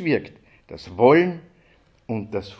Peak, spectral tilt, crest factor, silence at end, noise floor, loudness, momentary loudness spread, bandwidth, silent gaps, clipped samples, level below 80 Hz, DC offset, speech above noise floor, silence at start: -2 dBFS; -8 dB/octave; 20 dB; 0.05 s; -57 dBFS; -20 LUFS; 24 LU; 7.6 kHz; none; under 0.1%; -54 dBFS; under 0.1%; 37 dB; 0 s